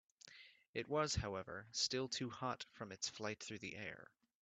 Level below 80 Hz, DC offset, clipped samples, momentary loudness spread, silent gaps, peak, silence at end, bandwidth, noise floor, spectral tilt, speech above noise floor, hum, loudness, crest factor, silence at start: -64 dBFS; under 0.1%; under 0.1%; 20 LU; 0.69-0.73 s; -24 dBFS; 0.4 s; 9 kHz; -64 dBFS; -3 dB/octave; 20 dB; none; -44 LUFS; 20 dB; 0.25 s